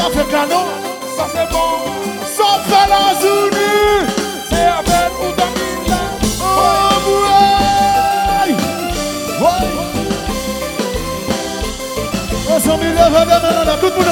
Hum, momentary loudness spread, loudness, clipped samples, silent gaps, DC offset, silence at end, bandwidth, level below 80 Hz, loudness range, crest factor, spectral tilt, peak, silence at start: none; 9 LU; -14 LUFS; under 0.1%; none; under 0.1%; 0 s; over 20 kHz; -30 dBFS; 5 LU; 14 dB; -3.5 dB/octave; 0 dBFS; 0 s